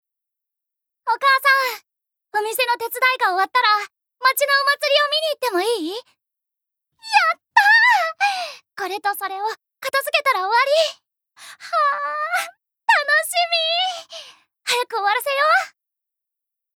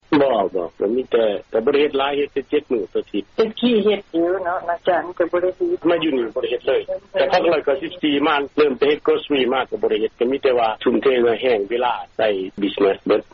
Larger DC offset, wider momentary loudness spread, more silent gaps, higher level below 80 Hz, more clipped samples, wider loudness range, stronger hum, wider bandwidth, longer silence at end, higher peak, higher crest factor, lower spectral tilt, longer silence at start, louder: neither; first, 14 LU vs 6 LU; neither; second, -88 dBFS vs -54 dBFS; neither; about the same, 3 LU vs 2 LU; neither; first, over 20 kHz vs 6.4 kHz; first, 1.1 s vs 0.1 s; first, 0 dBFS vs -6 dBFS; first, 20 dB vs 12 dB; second, 1.5 dB/octave vs -2.5 dB/octave; first, 1.05 s vs 0.1 s; about the same, -18 LUFS vs -20 LUFS